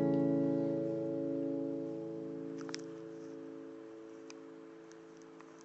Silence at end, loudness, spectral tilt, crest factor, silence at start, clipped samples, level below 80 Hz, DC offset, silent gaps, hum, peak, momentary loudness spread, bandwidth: 0 s; -38 LUFS; -8 dB/octave; 18 dB; 0 s; under 0.1%; -86 dBFS; under 0.1%; none; none; -20 dBFS; 21 LU; 8 kHz